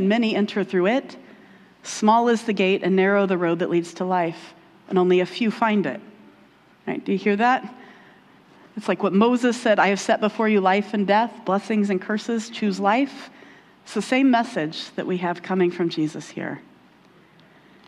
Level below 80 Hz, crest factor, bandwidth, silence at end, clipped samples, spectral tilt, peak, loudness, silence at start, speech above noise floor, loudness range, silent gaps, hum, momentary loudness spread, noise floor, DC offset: -72 dBFS; 18 dB; 11.5 kHz; 1.25 s; under 0.1%; -5.5 dB/octave; -4 dBFS; -22 LUFS; 0 s; 32 dB; 4 LU; none; none; 13 LU; -54 dBFS; under 0.1%